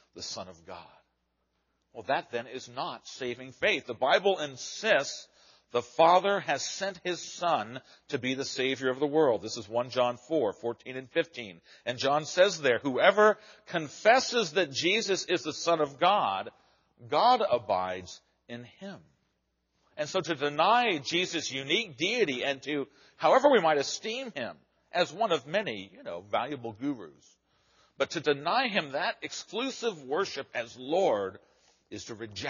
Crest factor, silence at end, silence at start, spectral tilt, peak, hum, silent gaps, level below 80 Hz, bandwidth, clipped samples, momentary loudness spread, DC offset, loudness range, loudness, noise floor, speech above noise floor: 24 dB; 0 s; 0.15 s; -1.5 dB/octave; -6 dBFS; none; none; -76 dBFS; 7.2 kHz; under 0.1%; 17 LU; under 0.1%; 7 LU; -29 LUFS; -77 dBFS; 48 dB